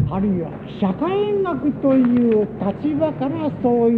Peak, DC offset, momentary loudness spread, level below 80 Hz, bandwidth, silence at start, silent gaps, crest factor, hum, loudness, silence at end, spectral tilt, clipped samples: -6 dBFS; under 0.1%; 7 LU; -44 dBFS; 4.4 kHz; 0 s; none; 12 dB; none; -20 LUFS; 0 s; -10.5 dB/octave; under 0.1%